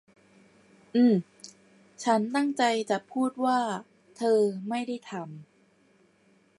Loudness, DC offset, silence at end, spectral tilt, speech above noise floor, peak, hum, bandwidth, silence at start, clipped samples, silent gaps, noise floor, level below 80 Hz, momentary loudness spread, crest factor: -27 LUFS; under 0.1%; 1.15 s; -5.5 dB/octave; 38 dB; -10 dBFS; none; 11.5 kHz; 0.95 s; under 0.1%; none; -64 dBFS; -82 dBFS; 18 LU; 18 dB